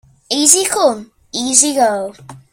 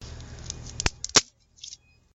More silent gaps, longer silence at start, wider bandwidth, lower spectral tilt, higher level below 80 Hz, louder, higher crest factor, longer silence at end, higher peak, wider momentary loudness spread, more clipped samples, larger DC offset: neither; first, 0.3 s vs 0 s; first, over 20 kHz vs 16.5 kHz; about the same, -1 dB/octave vs -1 dB/octave; second, -58 dBFS vs -44 dBFS; first, -12 LUFS vs -23 LUFS; second, 16 dB vs 28 dB; second, 0.15 s vs 0.4 s; about the same, 0 dBFS vs -2 dBFS; second, 16 LU vs 23 LU; first, 0.1% vs under 0.1%; neither